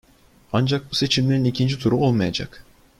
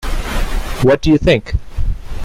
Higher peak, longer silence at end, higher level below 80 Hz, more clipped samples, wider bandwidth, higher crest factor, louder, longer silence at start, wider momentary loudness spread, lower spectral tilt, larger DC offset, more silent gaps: second, -6 dBFS vs 0 dBFS; first, 0.4 s vs 0 s; second, -50 dBFS vs -20 dBFS; neither; second, 13 kHz vs 16 kHz; about the same, 16 dB vs 14 dB; second, -21 LUFS vs -16 LUFS; first, 0.55 s vs 0 s; second, 7 LU vs 13 LU; about the same, -6 dB/octave vs -6.5 dB/octave; neither; neither